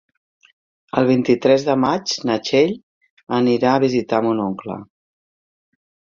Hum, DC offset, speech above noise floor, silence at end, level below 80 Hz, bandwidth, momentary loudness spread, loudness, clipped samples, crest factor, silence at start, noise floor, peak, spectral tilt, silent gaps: none; under 0.1%; over 73 dB; 1.3 s; -60 dBFS; 7.4 kHz; 10 LU; -18 LUFS; under 0.1%; 18 dB; 0.95 s; under -90 dBFS; -2 dBFS; -5.5 dB/octave; 2.83-3.01 s, 3.10-3.17 s, 3.23-3.27 s